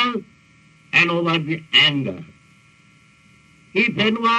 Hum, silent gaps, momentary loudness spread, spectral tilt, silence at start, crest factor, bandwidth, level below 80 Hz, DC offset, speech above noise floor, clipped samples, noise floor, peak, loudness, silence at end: none; none; 14 LU; -5 dB/octave; 0 s; 18 dB; 11 kHz; -62 dBFS; under 0.1%; 34 dB; under 0.1%; -53 dBFS; -2 dBFS; -18 LUFS; 0 s